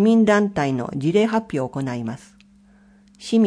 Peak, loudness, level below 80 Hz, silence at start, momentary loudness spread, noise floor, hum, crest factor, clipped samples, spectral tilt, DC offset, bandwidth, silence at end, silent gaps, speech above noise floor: -6 dBFS; -21 LUFS; -56 dBFS; 0 s; 15 LU; -52 dBFS; none; 16 dB; under 0.1%; -6.5 dB/octave; under 0.1%; 10.5 kHz; 0 s; none; 33 dB